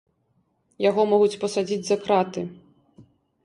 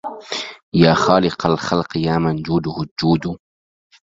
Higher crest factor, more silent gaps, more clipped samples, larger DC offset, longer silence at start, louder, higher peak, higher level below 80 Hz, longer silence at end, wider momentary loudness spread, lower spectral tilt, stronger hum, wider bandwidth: about the same, 18 dB vs 18 dB; second, none vs 0.62-0.72 s, 2.91-2.96 s; neither; neither; first, 0.8 s vs 0.05 s; second, -23 LUFS vs -18 LUFS; second, -8 dBFS vs 0 dBFS; second, -68 dBFS vs -46 dBFS; second, 0.4 s vs 0.75 s; about the same, 10 LU vs 12 LU; second, -5 dB/octave vs -6.5 dB/octave; neither; first, 11.5 kHz vs 7.8 kHz